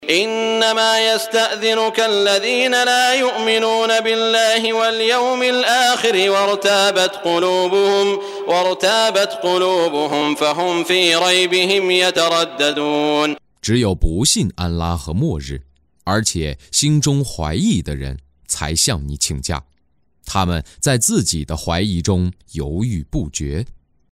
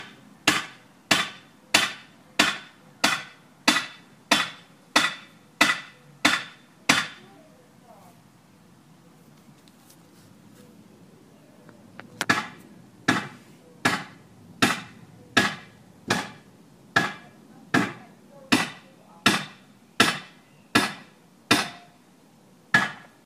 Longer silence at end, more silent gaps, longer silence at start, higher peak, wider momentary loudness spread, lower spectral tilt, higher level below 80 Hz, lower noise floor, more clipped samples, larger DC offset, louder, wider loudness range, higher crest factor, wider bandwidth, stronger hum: first, 0.4 s vs 0.25 s; neither; about the same, 0 s vs 0 s; about the same, 0 dBFS vs -2 dBFS; second, 10 LU vs 19 LU; first, -3.5 dB/octave vs -2 dB/octave; first, -34 dBFS vs -68 dBFS; first, -65 dBFS vs -55 dBFS; neither; neither; first, -16 LUFS vs -24 LUFS; about the same, 5 LU vs 6 LU; second, 16 dB vs 28 dB; about the same, 16 kHz vs 15.5 kHz; neither